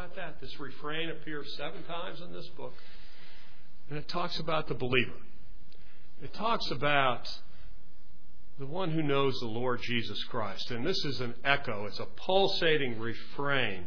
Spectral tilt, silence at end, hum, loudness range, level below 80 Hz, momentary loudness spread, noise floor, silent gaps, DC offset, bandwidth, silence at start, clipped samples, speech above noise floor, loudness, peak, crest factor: -5.5 dB/octave; 0 s; none; 10 LU; -56 dBFS; 17 LU; -58 dBFS; none; 4%; 5.4 kHz; 0 s; under 0.1%; 25 dB; -32 LUFS; -8 dBFS; 26 dB